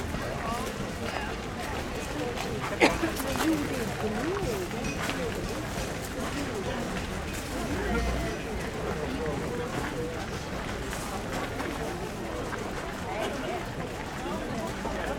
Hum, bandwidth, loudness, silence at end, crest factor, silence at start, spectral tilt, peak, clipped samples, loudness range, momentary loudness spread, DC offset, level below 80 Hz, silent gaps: none; 18.5 kHz; -32 LUFS; 0 s; 26 dB; 0 s; -4.5 dB/octave; -6 dBFS; under 0.1%; 5 LU; 6 LU; under 0.1%; -42 dBFS; none